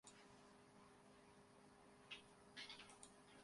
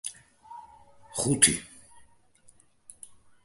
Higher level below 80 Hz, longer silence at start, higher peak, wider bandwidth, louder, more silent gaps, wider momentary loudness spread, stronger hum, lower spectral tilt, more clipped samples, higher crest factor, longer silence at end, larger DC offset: second, -86 dBFS vs -58 dBFS; about the same, 0.05 s vs 0.05 s; second, -40 dBFS vs -4 dBFS; about the same, 11.5 kHz vs 12 kHz; second, -62 LUFS vs -24 LUFS; neither; second, 11 LU vs 27 LU; neither; about the same, -2.5 dB/octave vs -2.5 dB/octave; neither; second, 24 dB vs 30 dB; second, 0 s vs 1.8 s; neither